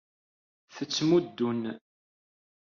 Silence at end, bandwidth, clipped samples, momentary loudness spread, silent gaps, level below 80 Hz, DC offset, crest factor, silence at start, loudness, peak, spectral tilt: 0.85 s; 7.2 kHz; under 0.1%; 15 LU; none; -72 dBFS; under 0.1%; 18 dB; 0.75 s; -28 LUFS; -12 dBFS; -5 dB/octave